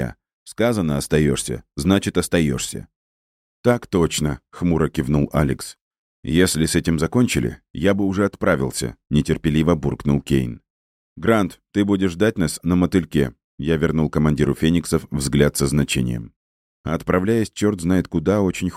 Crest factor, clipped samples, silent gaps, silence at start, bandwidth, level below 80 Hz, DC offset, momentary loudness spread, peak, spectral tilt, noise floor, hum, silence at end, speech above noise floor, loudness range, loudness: 18 dB; under 0.1%; 0.33-0.46 s, 2.96-3.64 s, 5.81-5.91 s, 5.98-6.23 s, 7.70-7.74 s, 10.70-11.16 s, 13.44-13.58 s, 16.36-16.84 s; 0 s; 15.5 kHz; -38 dBFS; under 0.1%; 8 LU; -2 dBFS; -5.5 dB/octave; under -90 dBFS; none; 0 s; over 71 dB; 2 LU; -20 LUFS